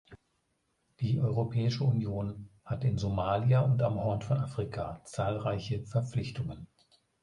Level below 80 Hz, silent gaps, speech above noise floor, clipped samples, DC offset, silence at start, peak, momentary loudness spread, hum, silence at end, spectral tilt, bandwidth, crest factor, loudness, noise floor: -54 dBFS; none; 47 dB; under 0.1%; under 0.1%; 0.1 s; -16 dBFS; 12 LU; none; 0.55 s; -8 dB/octave; 11 kHz; 16 dB; -32 LUFS; -77 dBFS